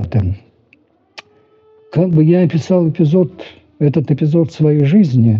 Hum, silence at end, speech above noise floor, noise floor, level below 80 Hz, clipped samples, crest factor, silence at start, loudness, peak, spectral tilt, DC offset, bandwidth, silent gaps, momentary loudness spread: none; 0 s; 41 dB; -54 dBFS; -46 dBFS; under 0.1%; 12 dB; 0 s; -14 LUFS; -2 dBFS; -9.5 dB/octave; under 0.1%; 7 kHz; none; 10 LU